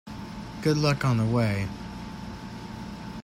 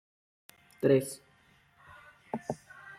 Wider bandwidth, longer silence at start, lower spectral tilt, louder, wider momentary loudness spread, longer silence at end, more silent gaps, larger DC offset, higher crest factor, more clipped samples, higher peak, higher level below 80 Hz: about the same, 15 kHz vs 15.5 kHz; second, 0.05 s vs 0.8 s; about the same, -6.5 dB/octave vs -6.5 dB/octave; first, -27 LUFS vs -32 LUFS; second, 15 LU vs 27 LU; about the same, 0 s vs 0.05 s; neither; neither; second, 16 dB vs 22 dB; neither; about the same, -12 dBFS vs -12 dBFS; first, -48 dBFS vs -74 dBFS